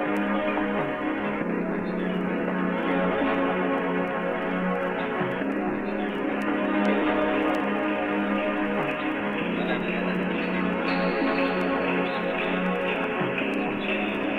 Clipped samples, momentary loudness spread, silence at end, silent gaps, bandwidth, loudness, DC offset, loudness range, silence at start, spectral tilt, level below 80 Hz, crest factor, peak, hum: under 0.1%; 4 LU; 0 s; none; 9.8 kHz; -26 LUFS; under 0.1%; 1 LU; 0 s; -7.5 dB/octave; -54 dBFS; 14 dB; -10 dBFS; none